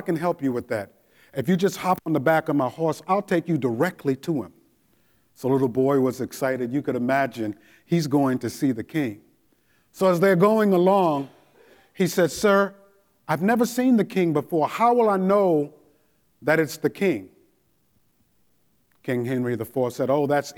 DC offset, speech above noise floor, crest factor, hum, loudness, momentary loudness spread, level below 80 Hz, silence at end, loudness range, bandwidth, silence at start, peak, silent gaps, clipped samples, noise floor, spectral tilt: under 0.1%; 45 dB; 18 dB; none; -23 LUFS; 11 LU; -66 dBFS; 0.05 s; 6 LU; 19.5 kHz; 0 s; -6 dBFS; none; under 0.1%; -67 dBFS; -6.5 dB/octave